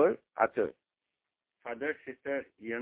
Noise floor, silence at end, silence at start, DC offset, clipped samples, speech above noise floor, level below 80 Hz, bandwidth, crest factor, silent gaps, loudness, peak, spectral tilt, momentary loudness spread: -89 dBFS; 0 s; 0 s; under 0.1%; under 0.1%; 55 dB; -74 dBFS; 3.9 kHz; 24 dB; none; -34 LUFS; -10 dBFS; -4.5 dB/octave; 11 LU